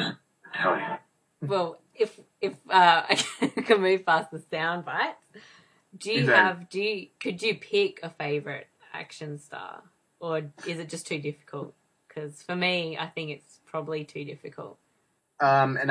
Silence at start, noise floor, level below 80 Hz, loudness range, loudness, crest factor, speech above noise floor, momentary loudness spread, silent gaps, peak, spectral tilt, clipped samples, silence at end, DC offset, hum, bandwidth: 0 s; -72 dBFS; -80 dBFS; 11 LU; -26 LUFS; 26 dB; 45 dB; 19 LU; none; -4 dBFS; -4.5 dB/octave; under 0.1%; 0 s; under 0.1%; none; 11 kHz